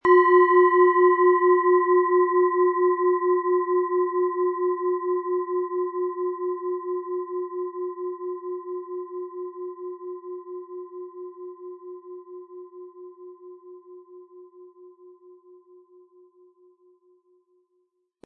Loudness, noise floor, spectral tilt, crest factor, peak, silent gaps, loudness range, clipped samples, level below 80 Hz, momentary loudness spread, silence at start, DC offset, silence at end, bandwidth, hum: -22 LUFS; -72 dBFS; -7.5 dB/octave; 18 dB; -6 dBFS; none; 23 LU; under 0.1%; -78 dBFS; 24 LU; 0.05 s; under 0.1%; 3.15 s; 3.2 kHz; none